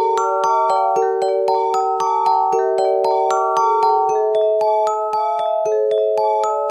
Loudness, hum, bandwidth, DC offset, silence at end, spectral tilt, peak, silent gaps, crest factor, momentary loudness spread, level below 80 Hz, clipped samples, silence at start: -17 LUFS; none; 12 kHz; under 0.1%; 0 s; -3.5 dB/octave; -6 dBFS; none; 12 dB; 3 LU; -74 dBFS; under 0.1%; 0 s